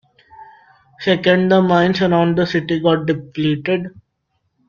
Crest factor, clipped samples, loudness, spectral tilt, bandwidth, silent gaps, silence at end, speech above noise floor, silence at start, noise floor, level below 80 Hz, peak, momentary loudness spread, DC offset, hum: 16 dB; under 0.1%; -16 LUFS; -7.5 dB/octave; 7 kHz; none; 0.8 s; 54 dB; 0.4 s; -69 dBFS; -54 dBFS; -2 dBFS; 9 LU; under 0.1%; none